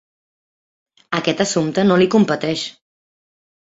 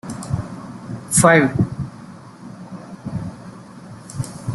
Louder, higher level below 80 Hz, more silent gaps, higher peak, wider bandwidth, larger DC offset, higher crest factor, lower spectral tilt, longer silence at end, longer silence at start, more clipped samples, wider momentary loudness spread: about the same, -17 LUFS vs -19 LUFS; second, -58 dBFS vs -48 dBFS; neither; about the same, -2 dBFS vs -2 dBFS; second, 8 kHz vs 12.5 kHz; neither; about the same, 18 dB vs 20 dB; about the same, -5 dB/octave vs -5 dB/octave; first, 1.1 s vs 0 s; first, 1.1 s vs 0.05 s; neither; second, 11 LU vs 26 LU